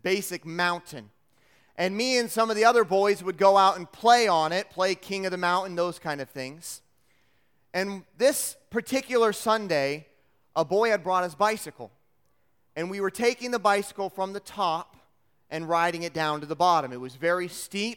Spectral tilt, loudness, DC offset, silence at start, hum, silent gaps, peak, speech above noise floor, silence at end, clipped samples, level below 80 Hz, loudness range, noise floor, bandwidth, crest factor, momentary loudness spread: -3.5 dB/octave; -26 LUFS; under 0.1%; 0.05 s; none; none; -6 dBFS; 47 dB; 0 s; under 0.1%; -70 dBFS; 7 LU; -72 dBFS; 18 kHz; 22 dB; 16 LU